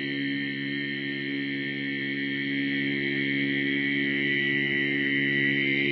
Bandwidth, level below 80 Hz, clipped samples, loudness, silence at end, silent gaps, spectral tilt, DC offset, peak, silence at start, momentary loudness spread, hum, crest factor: 6 kHz; -76 dBFS; under 0.1%; -26 LUFS; 0 s; none; -7 dB/octave; under 0.1%; -14 dBFS; 0 s; 7 LU; none; 14 dB